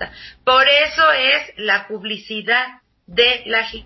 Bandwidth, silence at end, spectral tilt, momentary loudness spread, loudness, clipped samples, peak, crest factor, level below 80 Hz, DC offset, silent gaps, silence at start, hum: 6.2 kHz; 0.05 s; -2.5 dB/octave; 13 LU; -16 LUFS; under 0.1%; -2 dBFS; 16 dB; -50 dBFS; under 0.1%; none; 0 s; none